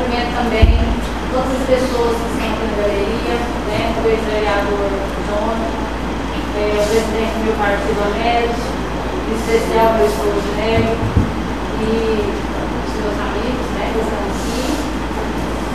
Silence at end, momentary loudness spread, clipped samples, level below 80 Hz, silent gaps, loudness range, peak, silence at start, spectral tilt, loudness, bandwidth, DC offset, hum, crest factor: 0 s; 6 LU; under 0.1%; -24 dBFS; none; 3 LU; 0 dBFS; 0 s; -5.5 dB/octave; -18 LUFS; 14.5 kHz; 2%; none; 18 dB